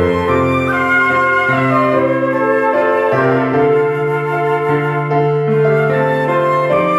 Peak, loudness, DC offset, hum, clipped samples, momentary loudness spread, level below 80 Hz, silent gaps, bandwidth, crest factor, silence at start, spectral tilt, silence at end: -4 dBFS; -14 LUFS; under 0.1%; none; under 0.1%; 3 LU; -50 dBFS; none; 12.5 kHz; 10 dB; 0 s; -8 dB/octave; 0 s